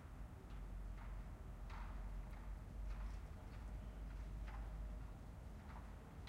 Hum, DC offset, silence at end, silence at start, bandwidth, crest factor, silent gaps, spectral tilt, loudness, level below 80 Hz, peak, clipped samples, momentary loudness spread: none; under 0.1%; 0 s; 0 s; 12.5 kHz; 12 dB; none; -7 dB/octave; -54 LUFS; -52 dBFS; -38 dBFS; under 0.1%; 4 LU